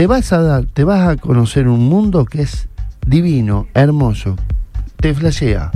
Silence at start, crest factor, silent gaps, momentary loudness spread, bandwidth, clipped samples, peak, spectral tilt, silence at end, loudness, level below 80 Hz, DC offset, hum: 0 s; 12 dB; none; 10 LU; 12 kHz; under 0.1%; 0 dBFS; -7.5 dB/octave; 0 s; -14 LUFS; -22 dBFS; under 0.1%; none